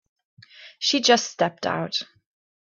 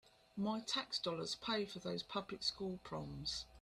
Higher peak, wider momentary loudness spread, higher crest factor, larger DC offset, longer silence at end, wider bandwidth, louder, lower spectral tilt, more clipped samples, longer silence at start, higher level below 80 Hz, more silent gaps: first, -4 dBFS vs -24 dBFS; first, 11 LU vs 7 LU; about the same, 20 dB vs 18 dB; neither; first, 0.6 s vs 0 s; second, 7.4 kHz vs 13.5 kHz; first, -22 LUFS vs -42 LUFS; second, -2.5 dB/octave vs -4 dB/octave; neither; first, 0.6 s vs 0.35 s; about the same, -70 dBFS vs -66 dBFS; neither